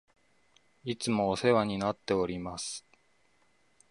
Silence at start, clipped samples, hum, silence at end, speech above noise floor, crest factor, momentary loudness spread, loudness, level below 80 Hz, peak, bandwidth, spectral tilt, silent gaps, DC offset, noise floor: 0.85 s; under 0.1%; none; 1.1 s; 40 dB; 22 dB; 12 LU; -31 LUFS; -60 dBFS; -12 dBFS; 11.5 kHz; -5 dB/octave; none; under 0.1%; -70 dBFS